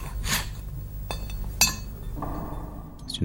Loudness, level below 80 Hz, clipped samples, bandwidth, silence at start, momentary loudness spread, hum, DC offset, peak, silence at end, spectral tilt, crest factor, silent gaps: -29 LUFS; -36 dBFS; under 0.1%; 17 kHz; 0 s; 15 LU; 50 Hz at -35 dBFS; under 0.1%; -4 dBFS; 0 s; -2.5 dB/octave; 26 dB; none